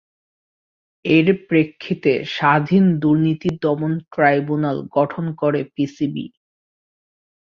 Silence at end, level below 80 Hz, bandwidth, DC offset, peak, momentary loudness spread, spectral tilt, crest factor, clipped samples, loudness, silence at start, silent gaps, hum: 1.15 s; -58 dBFS; 7 kHz; under 0.1%; -2 dBFS; 9 LU; -8.5 dB/octave; 18 dB; under 0.1%; -19 LUFS; 1.05 s; none; none